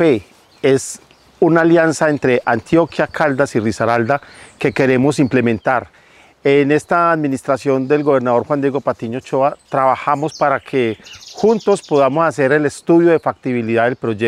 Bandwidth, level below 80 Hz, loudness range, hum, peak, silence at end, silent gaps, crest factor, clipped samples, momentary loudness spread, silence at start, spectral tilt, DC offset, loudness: 12.5 kHz; -56 dBFS; 2 LU; none; -2 dBFS; 0 s; none; 14 dB; under 0.1%; 8 LU; 0 s; -6 dB/octave; under 0.1%; -16 LUFS